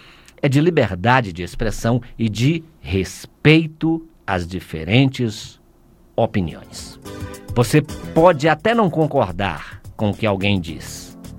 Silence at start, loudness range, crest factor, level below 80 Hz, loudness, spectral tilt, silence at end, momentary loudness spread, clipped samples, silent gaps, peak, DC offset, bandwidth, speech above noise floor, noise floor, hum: 0.45 s; 4 LU; 20 dB; -38 dBFS; -19 LUFS; -6 dB/octave; 0 s; 18 LU; under 0.1%; none; 0 dBFS; under 0.1%; 16.5 kHz; 32 dB; -51 dBFS; none